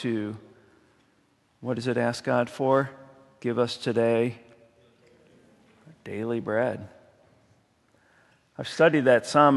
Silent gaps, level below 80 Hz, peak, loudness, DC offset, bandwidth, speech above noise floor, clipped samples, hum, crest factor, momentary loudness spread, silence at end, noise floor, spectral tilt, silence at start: none; -68 dBFS; -4 dBFS; -25 LUFS; under 0.1%; 12 kHz; 42 dB; under 0.1%; none; 24 dB; 18 LU; 0 s; -66 dBFS; -6 dB/octave; 0 s